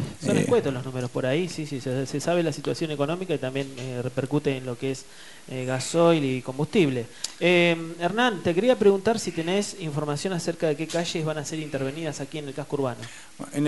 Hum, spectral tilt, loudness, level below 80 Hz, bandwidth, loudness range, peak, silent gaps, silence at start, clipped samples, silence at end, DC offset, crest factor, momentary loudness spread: none; -5 dB/octave; -26 LUFS; -62 dBFS; 11.5 kHz; 6 LU; -8 dBFS; none; 0 s; under 0.1%; 0 s; 0.4%; 18 dB; 12 LU